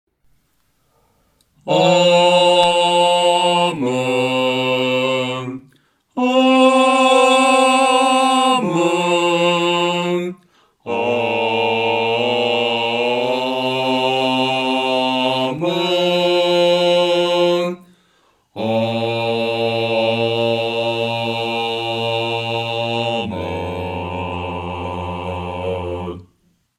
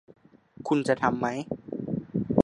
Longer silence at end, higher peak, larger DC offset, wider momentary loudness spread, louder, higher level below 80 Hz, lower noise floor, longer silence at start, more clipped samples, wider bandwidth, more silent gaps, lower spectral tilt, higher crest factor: first, 0.55 s vs 0 s; first, 0 dBFS vs -4 dBFS; neither; first, 13 LU vs 10 LU; first, -17 LUFS vs -29 LUFS; about the same, -60 dBFS vs -56 dBFS; first, -64 dBFS vs -49 dBFS; first, 1.65 s vs 0.6 s; neither; first, 14 kHz vs 11 kHz; neither; second, -4.5 dB/octave vs -7 dB/octave; second, 16 dB vs 24 dB